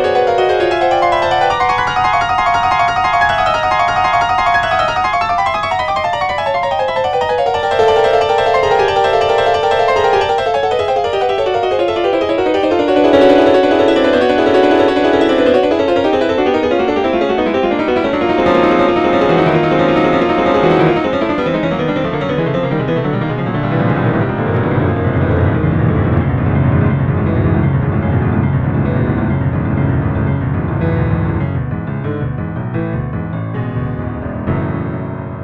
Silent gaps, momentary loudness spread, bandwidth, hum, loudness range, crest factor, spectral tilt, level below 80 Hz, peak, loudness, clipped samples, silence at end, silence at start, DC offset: none; 7 LU; 9.8 kHz; none; 5 LU; 14 dB; -7 dB/octave; -32 dBFS; 0 dBFS; -14 LUFS; under 0.1%; 0 s; 0 s; under 0.1%